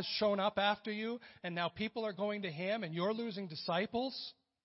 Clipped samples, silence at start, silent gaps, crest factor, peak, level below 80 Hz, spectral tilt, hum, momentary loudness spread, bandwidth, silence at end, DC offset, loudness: under 0.1%; 0 s; none; 20 dB; -18 dBFS; -74 dBFS; -3 dB/octave; none; 9 LU; 5.8 kHz; 0.35 s; under 0.1%; -37 LUFS